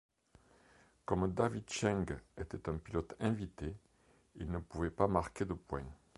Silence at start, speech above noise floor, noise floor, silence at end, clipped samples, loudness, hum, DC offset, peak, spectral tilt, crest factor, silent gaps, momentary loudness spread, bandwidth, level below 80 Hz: 1.1 s; 32 dB; -70 dBFS; 0.25 s; under 0.1%; -39 LUFS; none; under 0.1%; -14 dBFS; -6.5 dB/octave; 24 dB; none; 12 LU; 11.5 kHz; -52 dBFS